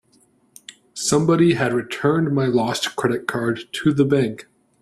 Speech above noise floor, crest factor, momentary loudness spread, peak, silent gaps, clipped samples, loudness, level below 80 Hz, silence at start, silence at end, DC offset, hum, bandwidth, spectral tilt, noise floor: 40 dB; 16 dB; 8 LU; -4 dBFS; none; under 0.1%; -20 LUFS; -56 dBFS; 0.95 s; 0.4 s; under 0.1%; none; 14 kHz; -5.5 dB/octave; -59 dBFS